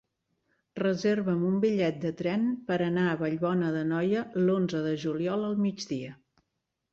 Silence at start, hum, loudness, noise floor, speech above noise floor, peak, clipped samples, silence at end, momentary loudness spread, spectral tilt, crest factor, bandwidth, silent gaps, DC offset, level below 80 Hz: 0.75 s; none; -29 LUFS; -82 dBFS; 54 dB; -16 dBFS; under 0.1%; 0.8 s; 6 LU; -7 dB/octave; 14 dB; 7.6 kHz; none; under 0.1%; -68 dBFS